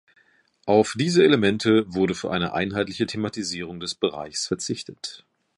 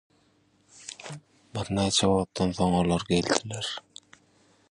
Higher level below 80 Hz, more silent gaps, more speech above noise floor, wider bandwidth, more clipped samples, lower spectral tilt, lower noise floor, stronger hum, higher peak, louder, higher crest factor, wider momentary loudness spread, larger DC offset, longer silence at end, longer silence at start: second, -56 dBFS vs -50 dBFS; neither; about the same, 39 dB vs 39 dB; about the same, 11.5 kHz vs 11 kHz; neither; about the same, -5 dB/octave vs -4.5 dB/octave; about the same, -62 dBFS vs -65 dBFS; neither; about the same, -4 dBFS vs -4 dBFS; first, -23 LUFS vs -26 LUFS; second, 20 dB vs 26 dB; second, 13 LU vs 19 LU; neither; second, 0.4 s vs 0.9 s; about the same, 0.65 s vs 0.75 s